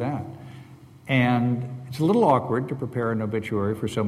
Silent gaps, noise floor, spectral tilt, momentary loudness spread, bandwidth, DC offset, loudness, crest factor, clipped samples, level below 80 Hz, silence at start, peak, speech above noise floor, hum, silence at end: none; -46 dBFS; -7.5 dB/octave; 17 LU; 14 kHz; under 0.1%; -24 LUFS; 18 dB; under 0.1%; -58 dBFS; 0 s; -6 dBFS; 23 dB; none; 0 s